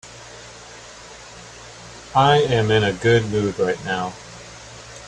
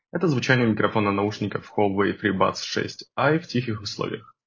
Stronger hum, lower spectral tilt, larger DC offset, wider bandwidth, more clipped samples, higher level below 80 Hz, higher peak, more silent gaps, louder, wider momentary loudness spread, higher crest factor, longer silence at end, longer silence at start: neither; about the same, -5.5 dB/octave vs -6 dB/octave; neither; first, 10.5 kHz vs 7.6 kHz; neither; first, -48 dBFS vs -56 dBFS; about the same, -2 dBFS vs -4 dBFS; neither; first, -19 LUFS vs -24 LUFS; first, 22 LU vs 9 LU; about the same, 20 dB vs 20 dB; second, 0 s vs 0.25 s; about the same, 0.05 s vs 0.15 s